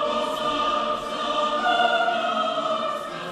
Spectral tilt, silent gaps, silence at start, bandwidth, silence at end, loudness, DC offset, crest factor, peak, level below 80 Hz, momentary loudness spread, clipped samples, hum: -3 dB/octave; none; 0 s; 13.5 kHz; 0 s; -23 LUFS; under 0.1%; 16 dB; -8 dBFS; -58 dBFS; 6 LU; under 0.1%; none